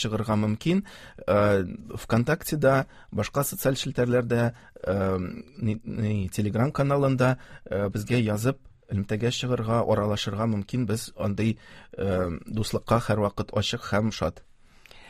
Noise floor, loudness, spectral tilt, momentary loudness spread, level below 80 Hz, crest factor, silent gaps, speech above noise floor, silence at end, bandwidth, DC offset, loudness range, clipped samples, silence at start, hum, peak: -51 dBFS; -27 LUFS; -6 dB/octave; 9 LU; -48 dBFS; 20 dB; none; 25 dB; 0 s; 15.5 kHz; under 0.1%; 2 LU; under 0.1%; 0 s; none; -6 dBFS